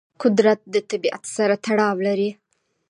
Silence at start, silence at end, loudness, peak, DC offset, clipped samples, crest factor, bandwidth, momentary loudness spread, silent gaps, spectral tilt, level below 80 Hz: 0.2 s; 0.55 s; -21 LUFS; -4 dBFS; under 0.1%; under 0.1%; 16 dB; 11.5 kHz; 7 LU; none; -5 dB/octave; -74 dBFS